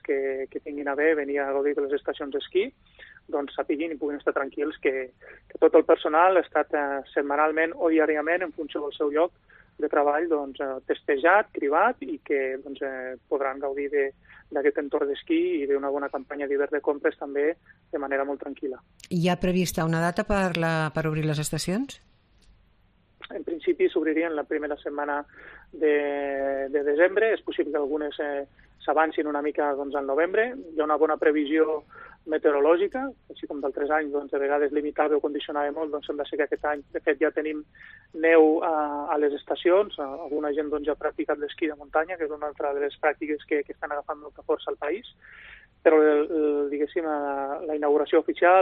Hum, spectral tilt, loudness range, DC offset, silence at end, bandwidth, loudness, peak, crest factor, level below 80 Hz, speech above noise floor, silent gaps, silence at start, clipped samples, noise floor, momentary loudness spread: none; -6 dB/octave; 5 LU; under 0.1%; 0 s; 10 kHz; -26 LUFS; -6 dBFS; 20 dB; -56 dBFS; 37 dB; none; 0.1 s; under 0.1%; -62 dBFS; 12 LU